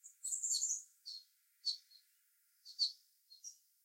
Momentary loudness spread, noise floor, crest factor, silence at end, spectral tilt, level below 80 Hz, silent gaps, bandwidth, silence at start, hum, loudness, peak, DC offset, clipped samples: 19 LU; -75 dBFS; 22 dB; 0.3 s; 10 dB/octave; under -90 dBFS; none; 16.5 kHz; 0.05 s; none; -39 LUFS; -24 dBFS; under 0.1%; under 0.1%